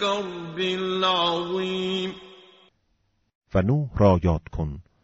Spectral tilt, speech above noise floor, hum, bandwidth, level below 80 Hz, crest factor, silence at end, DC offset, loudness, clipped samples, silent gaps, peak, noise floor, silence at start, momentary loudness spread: -4.5 dB/octave; 46 dB; none; 8 kHz; -42 dBFS; 18 dB; 0.25 s; under 0.1%; -24 LUFS; under 0.1%; 3.35-3.41 s; -6 dBFS; -70 dBFS; 0 s; 12 LU